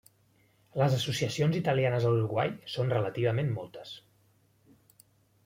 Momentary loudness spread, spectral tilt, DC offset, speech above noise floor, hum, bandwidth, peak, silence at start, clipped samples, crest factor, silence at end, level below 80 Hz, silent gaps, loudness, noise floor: 14 LU; -6 dB/octave; under 0.1%; 38 dB; none; 16 kHz; -14 dBFS; 0.75 s; under 0.1%; 18 dB; 1.45 s; -66 dBFS; none; -29 LUFS; -67 dBFS